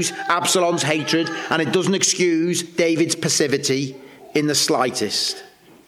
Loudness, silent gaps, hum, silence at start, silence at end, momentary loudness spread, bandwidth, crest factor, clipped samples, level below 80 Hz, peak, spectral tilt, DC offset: -19 LUFS; none; none; 0 s; 0.4 s; 5 LU; 18 kHz; 16 dB; under 0.1%; -68 dBFS; -4 dBFS; -3 dB/octave; under 0.1%